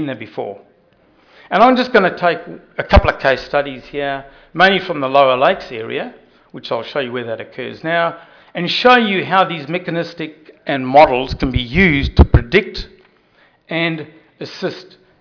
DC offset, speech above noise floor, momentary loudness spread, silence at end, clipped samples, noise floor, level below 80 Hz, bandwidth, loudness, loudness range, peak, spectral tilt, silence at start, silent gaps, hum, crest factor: under 0.1%; 38 dB; 18 LU; 0.35 s; under 0.1%; -54 dBFS; -26 dBFS; 5.4 kHz; -15 LUFS; 4 LU; 0 dBFS; -7 dB/octave; 0 s; none; none; 16 dB